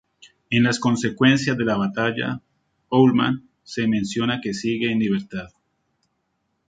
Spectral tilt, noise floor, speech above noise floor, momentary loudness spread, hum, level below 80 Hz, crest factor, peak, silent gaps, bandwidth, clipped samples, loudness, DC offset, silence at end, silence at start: -5.5 dB/octave; -73 dBFS; 52 dB; 11 LU; none; -56 dBFS; 20 dB; -2 dBFS; none; 9.2 kHz; under 0.1%; -21 LUFS; under 0.1%; 1.2 s; 0.5 s